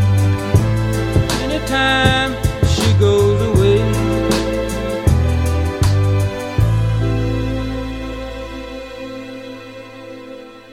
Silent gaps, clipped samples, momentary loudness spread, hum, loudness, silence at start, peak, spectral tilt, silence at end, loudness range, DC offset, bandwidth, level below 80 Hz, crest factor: none; under 0.1%; 18 LU; none; -16 LUFS; 0 s; 0 dBFS; -6 dB/octave; 0 s; 9 LU; under 0.1%; 15.5 kHz; -26 dBFS; 16 dB